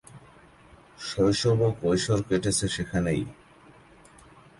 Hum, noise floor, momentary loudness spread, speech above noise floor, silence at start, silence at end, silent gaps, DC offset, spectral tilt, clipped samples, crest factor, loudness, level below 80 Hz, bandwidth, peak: none; -54 dBFS; 10 LU; 29 dB; 0.1 s; 1.25 s; none; under 0.1%; -5 dB/octave; under 0.1%; 16 dB; -26 LUFS; -50 dBFS; 11.5 kHz; -12 dBFS